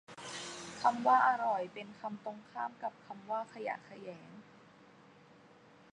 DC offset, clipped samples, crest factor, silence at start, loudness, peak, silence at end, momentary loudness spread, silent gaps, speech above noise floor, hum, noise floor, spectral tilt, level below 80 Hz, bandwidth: under 0.1%; under 0.1%; 22 dB; 0.1 s; -35 LUFS; -16 dBFS; 1.5 s; 21 LU; none; 26 dB; none; -61 dBFS; -3.5 dB/octave; -80 dBFS; 11 kHz